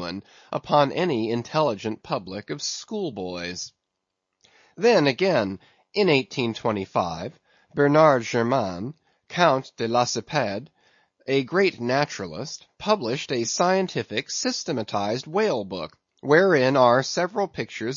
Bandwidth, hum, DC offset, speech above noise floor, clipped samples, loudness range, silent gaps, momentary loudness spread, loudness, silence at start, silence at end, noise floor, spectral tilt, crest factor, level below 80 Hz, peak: 7.6 kHz; none; under 0.1%; 58 dB; under 0.1%; 4 LU; none; 15 LU; -23 LUFS; 0 s; 0 s; -81 dBFS; -4.5 dB/octave; 20 dB; -64 dBFS; -4 dBFS